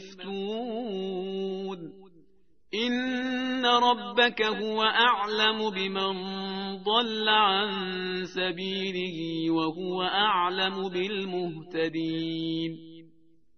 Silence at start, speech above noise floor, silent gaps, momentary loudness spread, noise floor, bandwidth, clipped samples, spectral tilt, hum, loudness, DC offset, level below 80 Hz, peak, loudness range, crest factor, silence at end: 0 s; 39 dB; none; 11 LU; -66 dBFS; 6.6 kHz; under 0.1%; -1.5 dB/octave; none; -27 LUFS; 0.1%; -68 dBFS; -8 dBFS; 5 LU; 20 dB; 0.55 s